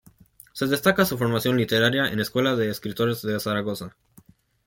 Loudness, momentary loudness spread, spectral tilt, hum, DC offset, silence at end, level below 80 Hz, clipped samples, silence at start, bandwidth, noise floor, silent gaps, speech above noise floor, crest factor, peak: -23 LUFS; 10 LU; -5 dB/octave; none; under 0.1%; 0.8 s; -58 dBFS; under 0.1%; 0.55 s; 17 kHz; -55 dBFS; none; 32 dB; 20 dB; -6 dBFS